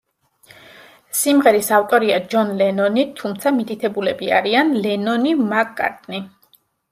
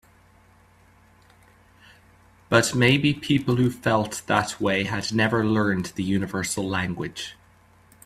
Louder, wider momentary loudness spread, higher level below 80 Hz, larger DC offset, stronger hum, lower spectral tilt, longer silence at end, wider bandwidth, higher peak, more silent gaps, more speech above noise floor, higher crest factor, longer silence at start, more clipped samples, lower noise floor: first, -18 LUFS vs -23 LUFS; about the same, 10 LU vs 8 LU; second, -66 dBFS vs -54 dBFS; neither; neither; about the same, -4 dB/octave vs -5 dB/octave; about the same, 0.65 s vs 0.75 s; about the same, 16 kHz vs 15 kHz; about the same, -2 dBFS vs -2 dBFS; neither; first, 40 dB vs 33 dB; about the same, 18 dB vs 22 dB; second, 1.15 s vs 2.5 s; neither; about the same, -58 dBFS vs -56 dBFS